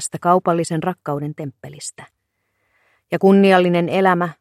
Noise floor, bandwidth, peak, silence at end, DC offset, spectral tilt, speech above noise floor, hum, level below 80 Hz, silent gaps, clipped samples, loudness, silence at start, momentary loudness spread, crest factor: -71 dBFS; 13 kHz; 0 dBFS; 0.1 s; under 0.1%; -6 dB/octave; 54 dB; none; -66 dBFS; none; under 0.1%; -17 LUFS; 0 s; 19 LU; 18 dB